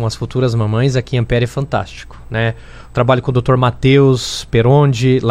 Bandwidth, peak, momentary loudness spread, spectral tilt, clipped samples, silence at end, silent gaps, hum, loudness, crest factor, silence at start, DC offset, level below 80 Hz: 10.5 kHz; 0 dBFS; 10 LU; -6.5 dB/octave; under 0.1%; 0 s; none; none; -15 LUFS; 14 dB; 0 s; under 0.1%; -34 dBFS